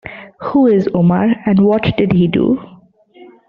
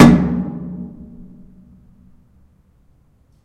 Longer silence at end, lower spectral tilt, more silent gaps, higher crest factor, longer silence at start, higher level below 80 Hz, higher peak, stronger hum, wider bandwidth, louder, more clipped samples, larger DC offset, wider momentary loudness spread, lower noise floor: second, 0.85 s vs 2.55 s; about the same, -7 dB/octave vs -7 dB/octave; neither; second, 12 dB vs 18 dB; about the same, 0.05 s vs 0 s; second, -44 dBFS vs -38 dBFS; about the same, -2 dBFS vs 0 dBFS; neither; second, 5.2 kHz vs 12 kHz; first, -13 LUFS vs -17 LUFS; second, under 0.1% vs 0.2%; neither; second, 7 LU vs 28 LU; second, -44 dBFS vs -54 dBFS